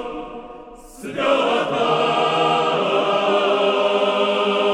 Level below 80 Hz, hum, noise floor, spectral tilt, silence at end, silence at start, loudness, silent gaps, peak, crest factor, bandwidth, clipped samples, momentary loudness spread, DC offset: -54 dBFS; none; -39 dBFS; -4.5 dB/octave; 0 s; 0 s; -18 LUFS; none; -6 dBFS; 14 dB; 12.5 kHz; under 0.1%; 15 LU; under 0.1%